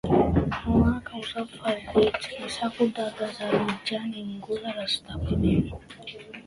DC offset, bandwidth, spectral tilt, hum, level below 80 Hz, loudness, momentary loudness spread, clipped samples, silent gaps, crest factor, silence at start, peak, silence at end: under 0.1%; 11.5 kHz; -6.5 dB/octave; none; -40 dBFS; -27 LUFS; 11 LU; under 0.1%; none; 18 dB; 0.05 s; -8 dBFS; 0.05 s